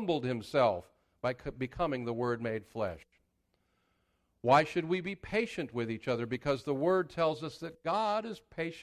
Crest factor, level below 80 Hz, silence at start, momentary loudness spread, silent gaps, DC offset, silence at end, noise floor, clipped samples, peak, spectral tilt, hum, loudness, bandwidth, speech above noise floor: 22 dB; -60 dBFS; 0 s; 11 LU; none; under 0.1%; 0 s; -77 dBFS; under 0.1%; -12 dBFS; -6.5 dB/octave; none; -33 LUFS; 14 kHz; 44 dB